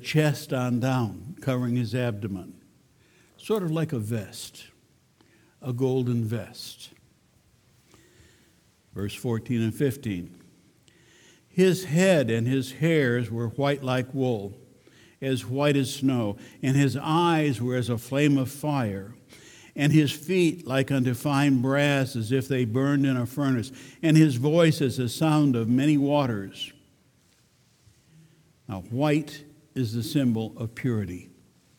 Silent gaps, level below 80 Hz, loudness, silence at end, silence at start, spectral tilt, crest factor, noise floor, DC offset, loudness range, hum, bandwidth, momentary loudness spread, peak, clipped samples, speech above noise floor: none; -64 dBFS; -25 LUFS; 0.55 s; 0 s; -6.5 dB/octave; 20 dB; -63 dBFS; under 0.1%; 9 LU; none; 19 kHz; 15 LU; -6 dBFS; under 0.1%; 38 dB